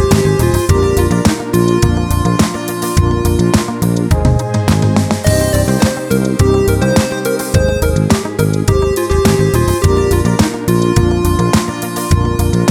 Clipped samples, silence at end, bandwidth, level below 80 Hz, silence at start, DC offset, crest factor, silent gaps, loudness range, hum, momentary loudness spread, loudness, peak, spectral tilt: under 0.1%; 0 s; 19 kHz; -22 dBFS; 0 s; under 0.1%; 12 dB; none; 1 LU; none; 3 LU; -13 LUFS; 0 dBFS; -6 dB/octave